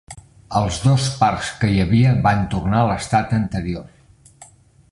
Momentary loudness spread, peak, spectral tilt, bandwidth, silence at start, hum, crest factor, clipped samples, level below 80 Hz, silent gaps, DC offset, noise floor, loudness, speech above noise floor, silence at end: 9 LU; -2 dBFS; -6 dB/octave; 11.5 kHz; 0.1 s; none; 16 dB; under 0.1%; -38 dBFS; none; under 0.1%; -47 dBFS; -19 LUFS; 30 dB; 0.45 s